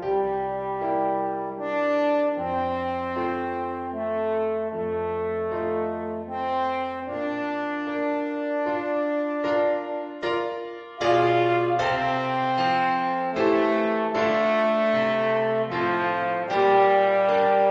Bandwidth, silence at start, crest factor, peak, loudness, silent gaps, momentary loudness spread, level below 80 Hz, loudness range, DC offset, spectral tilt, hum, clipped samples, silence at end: 7.8 kHz; 0 s; 16 dB; -8 dBFS; -24 LUFS; none; 9 LU; -58 dBFS; 6 LU; under 0.1%; -6.5 dB/octave; none; under 0.1%; 0 s